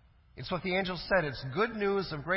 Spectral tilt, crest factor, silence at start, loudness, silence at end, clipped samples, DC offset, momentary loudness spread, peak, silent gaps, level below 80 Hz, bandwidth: -9.5 dB/octave; 18 dB; 0.35 s; -32 LUFS; 0 s; under 0.1%; under 0.1%; 6 LU; -14 dBFS; none; -54 dBFS; 5.8 kHz